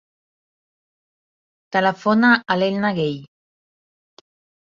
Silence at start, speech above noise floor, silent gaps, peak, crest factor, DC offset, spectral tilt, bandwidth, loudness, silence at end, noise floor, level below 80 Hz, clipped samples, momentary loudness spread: 1.7 s; over 72 dB; none; -2 dBFS; 20 dB; under 0.1%; -6.5 dB/octave; 7.2 kHz; -19 LUFS; 1.4 s; under -90 dBFS; -66 dBFS; under 0.1%; 9 LU